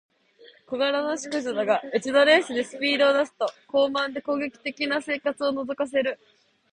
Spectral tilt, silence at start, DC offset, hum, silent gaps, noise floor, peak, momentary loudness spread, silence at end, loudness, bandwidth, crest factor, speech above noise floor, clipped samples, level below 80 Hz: -3 dB/octave; 0.7 s; under 0.1%; none; none; -54 dBFS; -6 dBFS; 9 LU; 0.55 s; -24 LUFS; 10 kHz; 20 dB; 30 dB; under 0.1%; -72 dBFS